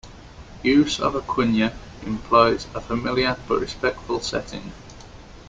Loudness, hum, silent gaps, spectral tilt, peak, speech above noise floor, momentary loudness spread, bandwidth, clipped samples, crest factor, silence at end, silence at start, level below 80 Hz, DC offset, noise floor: -22 LUFS; none; none; -5 dB/octave; -2 dBFS; 20 dB; 18 LU; 9.4 kHz; under 0.1%; 22 dB; 0 s; 0.05 s; -44 dBFS; under 0.1%; -42 dBFS